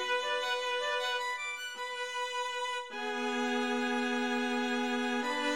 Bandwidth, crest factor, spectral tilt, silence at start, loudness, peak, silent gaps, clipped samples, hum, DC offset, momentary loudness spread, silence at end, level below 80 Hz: 16 kHz; 12 dB; -1.5 dB/octave; 0 s; -33 LUFS; -20 dBFS; none; under 0.1%; none; 0.1%; 5 LU; 0 s; -84 dBFS